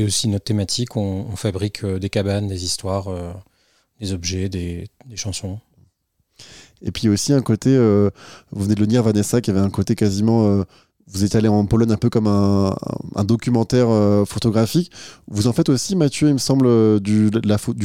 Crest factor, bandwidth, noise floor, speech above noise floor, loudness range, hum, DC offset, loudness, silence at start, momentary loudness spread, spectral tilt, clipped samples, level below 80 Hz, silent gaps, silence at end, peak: 16 dB; 16 kHz; -67 dBFS; 49 dB; 9 LU; none; 0.3%; -19 LUFS; 0 s; 14 LU; -6 dB/octave; under 0.1%; -46 dBFS; none; 0 s; -4 dBFS